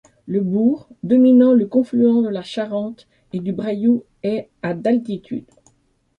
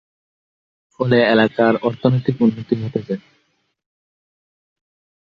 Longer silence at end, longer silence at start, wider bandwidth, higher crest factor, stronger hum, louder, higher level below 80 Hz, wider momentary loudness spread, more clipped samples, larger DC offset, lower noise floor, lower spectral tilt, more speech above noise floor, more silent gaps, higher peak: second, 0.8 s vs 2 s; second, 0.25 s vs 1 s; second, 5.4 kHz vs 6 kHz; second, 14 dB vs 20 dB; neither; about the same, -18 LUFS vs -18 LUFS; about the same, -62 dBFS vs -58 dBFS; first, 15 LU vs 11 LU; neither; neither; second, -62 dBFS vs -66 dBFS; about the same, -8.5 dB/octave vs -9 dB/octave; second, 44 dB vs 49 dB; neither; second, -4 dBFS vs 0 dBFS